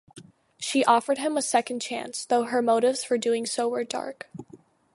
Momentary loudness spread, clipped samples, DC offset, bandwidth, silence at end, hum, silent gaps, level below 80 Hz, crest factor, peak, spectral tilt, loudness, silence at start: 13 LU; under 0.1%; under 0.1%; 11.5 kHz; 0.4 s; none; none; -76 dBFS; 20 dB; -6 dBFS; -2.5 dB/octave; -25 LUFS; 0.15 s